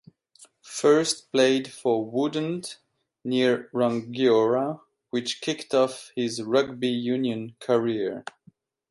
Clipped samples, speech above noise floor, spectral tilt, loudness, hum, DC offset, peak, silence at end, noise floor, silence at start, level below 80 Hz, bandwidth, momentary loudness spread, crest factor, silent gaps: under 0.1%; 35 dB; -4.5 dB/octave; -25 LUFS; none; under 0.1%; -6 dBFS; 0.7 s; -59 dBFS; 0.65 s; -72 dBFS; 11.5 kHz; 11 LU; 18 dB; none